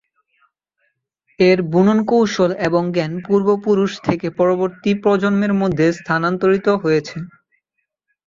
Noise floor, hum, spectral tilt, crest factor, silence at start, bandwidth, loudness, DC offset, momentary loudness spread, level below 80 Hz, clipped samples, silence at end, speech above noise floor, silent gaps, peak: -75 dBFS; none; -7 dB/octave; 16 dB; 1.4 s; 7.6 kHz; -17 LUFS; under 0.1%; 6 LU; -54 dBFS; under 0.1%; 1 s; 59 dB; none; -2 dBFS